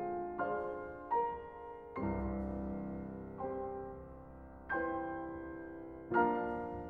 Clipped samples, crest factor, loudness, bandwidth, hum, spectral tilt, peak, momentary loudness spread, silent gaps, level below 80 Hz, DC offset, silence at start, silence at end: under 0.1%; 20 dB; -40 LUFS; 4.6 kHz; none; -10 dB/octave; -18 dBFS; 14 LU; none; -54 dBFS; under 0.1%; 0 s; 0 s